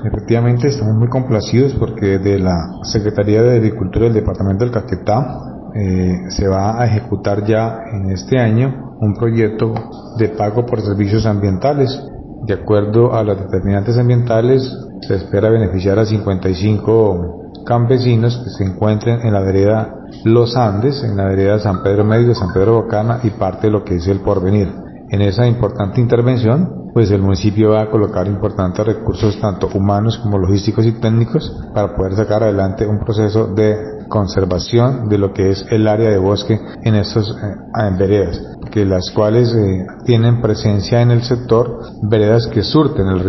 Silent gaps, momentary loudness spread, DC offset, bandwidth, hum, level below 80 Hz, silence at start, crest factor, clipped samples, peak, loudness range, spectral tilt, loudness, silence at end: none; 7 LU; under 0.1%; 6.2 kHz; none; -36 dBFS; 0 s; 14 dB; under 0.1%; 0 dBFS; 2 LU; -7.5 dB/octave; -15 LUFS; 0 s